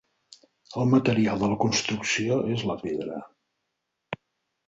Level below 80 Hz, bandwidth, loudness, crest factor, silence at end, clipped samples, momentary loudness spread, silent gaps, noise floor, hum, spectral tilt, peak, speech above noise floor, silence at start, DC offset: -58 dBFS; 8 kHz; -25 LUFS; 18 dB; 0.55 s; under 0.1%; 18 LU; none; -81 dBFS; none; -5 dB/octave; -8 dBFS; 56 dB; 0.7 s; under 0.1%